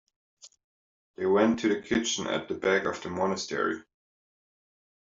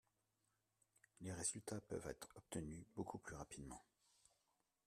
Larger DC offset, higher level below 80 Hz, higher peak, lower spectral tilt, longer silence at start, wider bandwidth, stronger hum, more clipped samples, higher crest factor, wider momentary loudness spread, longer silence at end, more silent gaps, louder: neither; first, -66 dBFS vs -72 dBFS; first, -8 dBFS vs -30 dBFS; about the same, -4 dB/octave vs -4 dB/octave; second, 0.45 s vs 1.2 s; second, 7.8 kHz vs 13.5 kHz; neither; neither; about the same, 22 dB vs 22 dB; second, 8 LU vs 12 LU; first, 1.3 s vs 1.05 s; first, 0.64-1.14 s vs none; first, -28 LUFS vs -51 LUFS